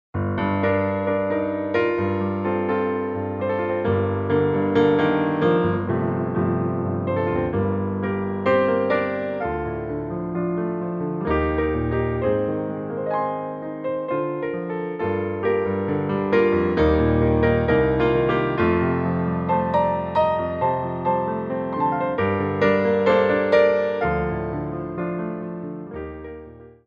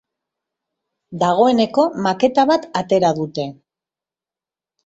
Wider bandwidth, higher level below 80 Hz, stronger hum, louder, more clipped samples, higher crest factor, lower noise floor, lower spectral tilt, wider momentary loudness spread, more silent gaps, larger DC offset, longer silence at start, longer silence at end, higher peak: second, 6.6 kHz vs 8 kHz; first, -40 dBFS vs -60 dBFS; neither; second, -22 LUFS vs -17 LUFS; neither; about the same, 16 dB vs 18 dB; second, -42 dBFS vs under -90 dBFS; first, -9.5 dB/octave vs -6 dB/octave; about the same, 9 LU vs 11 LU; neither; neither; second, 0.15 s vs 1.1 s; second, 0.15 s vs 1.35 s; second, -6 dBFS vs -2 dBFS